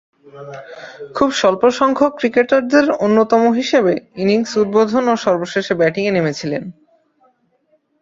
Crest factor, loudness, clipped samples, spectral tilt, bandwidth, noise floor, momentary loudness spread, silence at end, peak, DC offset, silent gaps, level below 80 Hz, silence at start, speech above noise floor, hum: 16 dB; -15 LUFS; under 0.1%; -5.5 dB/octave; 7.8 kHz; -61 dBFS; 19 LU; 1.3 s; -2 dBFS; under 0.1%; none; -56 dBFS; 0.35 s; 45 dB; none